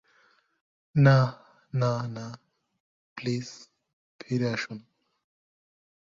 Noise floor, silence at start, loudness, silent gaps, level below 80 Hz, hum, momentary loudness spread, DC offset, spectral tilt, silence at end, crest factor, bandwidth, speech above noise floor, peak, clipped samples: -65 dBFS; 0.95 s; -27 LUFS; 2.80-3.16 s, 3.93-4.19 s; -64 dBFS; none; 22 LU; under 0.1%; -7 dB/octave; 1.3 s; 22 dB; 7.6 kHz; 40 dB; -8 dBFS; under 0.1%